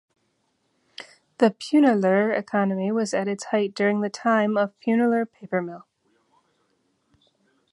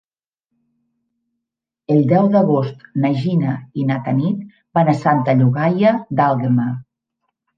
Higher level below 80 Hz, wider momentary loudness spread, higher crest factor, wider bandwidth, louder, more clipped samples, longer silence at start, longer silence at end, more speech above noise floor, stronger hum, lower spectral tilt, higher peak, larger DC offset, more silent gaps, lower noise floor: second, -74 dBFS vs -62 dBFS; first, 17 LU vs 8 LU; about the same, 20 dB vs 16 dB; first, 11.5 kHz vs 7.2 kHz; second, -23 LUFS vs -17 LUFS; neither; second, 1 s vs 1.9 s; first, 1.95 s vs 0.75 s; second, 49 dB vs 67 dB; neither; second, -6 dB/octave vs -9.5 dB/octave; second, -6 dBFS vs -2 dBFS; neither; neither; second, -71 dBFS vs -83 dBFS